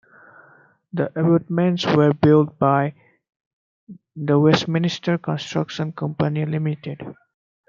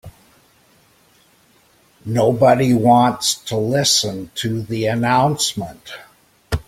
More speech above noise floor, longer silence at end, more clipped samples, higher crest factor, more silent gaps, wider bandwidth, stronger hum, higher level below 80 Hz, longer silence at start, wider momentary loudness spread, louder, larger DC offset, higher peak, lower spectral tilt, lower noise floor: second, 34 dB vs 38 dB; first, 0.55 s vs 0.05 s; neither; about the same, 20 dB vs 18 dB; first, 3.36-3.87 s vs none; second, 7.4 kHz vs 16.5 kHz; neither; second, -62 dBFS vs -44 dBFS; first, 0.95 s vs 0.05 s; second, 14 LU vs 17 LU; second, -20 LUFS vs -17 LUFS; neither; about the same, -2 dBFS vs -2 dBFS; first, -7.5 dB/octave vs -4.5 dB/octave; about the same, -54 dBFS vs -55 dBFS